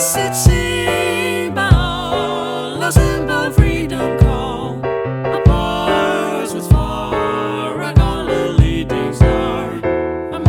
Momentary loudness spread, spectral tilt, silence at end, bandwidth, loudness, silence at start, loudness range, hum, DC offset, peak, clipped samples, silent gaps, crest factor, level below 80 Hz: 7 LU; -5.5 dB/octave; 0 s; 18.5 kHz; -16 LUFS; 0 s; 1 LU; none; under 0.1%; 0 dBFS; 0.6%; none; 14 dB; -22 dBFS